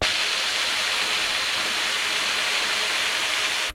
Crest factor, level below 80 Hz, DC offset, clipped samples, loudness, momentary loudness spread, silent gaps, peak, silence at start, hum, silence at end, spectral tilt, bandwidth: 16 dB; -56 dBFS; under 0.1%; under 0.1%; -21 LUFS; 1 LU; none; -8 dBFS; 0 s; none; 0 s; 0.5 dB/octave; 16.5 kHz